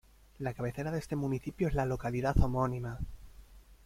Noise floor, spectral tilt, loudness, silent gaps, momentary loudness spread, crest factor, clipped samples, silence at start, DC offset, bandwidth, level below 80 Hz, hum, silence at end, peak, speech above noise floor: -55 dBFS; -8 dB/octave; -34 LUFS; none; 10 LU; 22 dB; under 0.1%; 0.4 s; under 0.1%; 16 kHz; -42 dBFS; none; 0.1 s; -12 dBFS; 23 dB